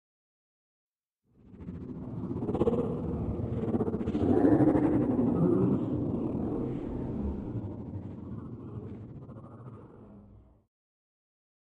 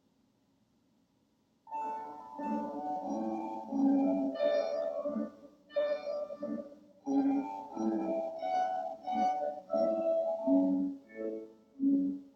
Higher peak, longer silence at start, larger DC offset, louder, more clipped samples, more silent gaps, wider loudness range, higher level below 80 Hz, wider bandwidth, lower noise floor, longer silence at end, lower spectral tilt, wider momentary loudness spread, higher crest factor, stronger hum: first, -10 dBFS vs -18 dBFS; second, 1.5 s vs 1.65 s; neither; first, -30 LUFS vs -34 LUFS; neither; neither; first, 17 LU vs 5 LU; first, -48 dBFS vs -78 dBFS; second, 4.3 kHz vs 6.4 kHz; about the same, -73 dBFS vs -73 dBFS; first, 1.25 s vs 0.05 s; first, -11 dB/octave vs -7.5 dB/octave; first, 21 LU vs 12 LU; about the same, 20 dB vs 16 dB; neither